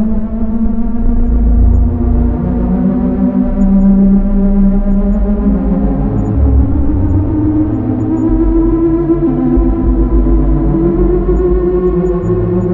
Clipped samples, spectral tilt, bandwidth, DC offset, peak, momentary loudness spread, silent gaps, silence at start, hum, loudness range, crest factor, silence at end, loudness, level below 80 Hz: under 0.1%; -12.5 dB/octave; 2.8 kHz; under 0.1%; 0 dBFS; 4 LU; none; 0 s; none; 1 LU; 10 dB; 0 s; -12 LUFS; -14 dBFS